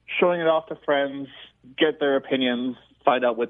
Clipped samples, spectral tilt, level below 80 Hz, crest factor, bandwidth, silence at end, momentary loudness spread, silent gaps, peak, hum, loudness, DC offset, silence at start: under 0.1%; -8 dB/octave; -68 dBFS; 20 dB; 3.9 kHz; 0 s; 12 LU; none; -4 dBFS; none; -23 LUFS; under 0.1%; 0.1 s